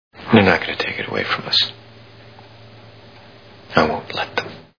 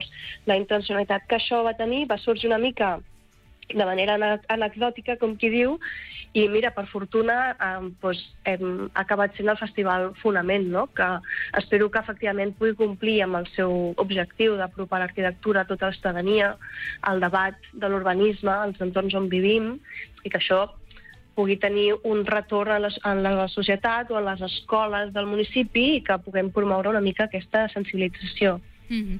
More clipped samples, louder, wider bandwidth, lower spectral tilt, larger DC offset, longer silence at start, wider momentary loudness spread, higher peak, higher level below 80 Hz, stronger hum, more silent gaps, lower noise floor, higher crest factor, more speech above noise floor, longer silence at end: neither; first, -18 LUFS vs -24 LUFS; about the same, 5.4 kHz vs 5.4 kHz; second, -5.5 dB/octave vs -7 dB/octave; first, 0.2% vs under 0.1%; first, 0.15 s vs 0 s; first, 10 LU vs 7 LU; first, 0 dBFS vs -10 dBFS; about the same, -52 dBFS vs -50 dBFS; neither; neither; second, -44 dBFS vs -54 dBFS; first, 22 dB vs 14 dB; second, 25 dB vs 29 dB; first, 0.15 s vs 0 s